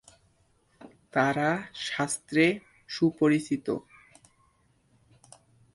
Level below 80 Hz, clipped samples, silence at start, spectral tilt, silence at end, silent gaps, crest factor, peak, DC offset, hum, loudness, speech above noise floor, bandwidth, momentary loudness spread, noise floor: -68 dBFS; under 0.1%; 0.8 s; -5 dB/octave; 1.95 s; none; 22 dB; -8 dBFS; under 0.1%; none; -28 LUFS; 40 dB; 11.5 kHz; 10 LU; -67 dBFS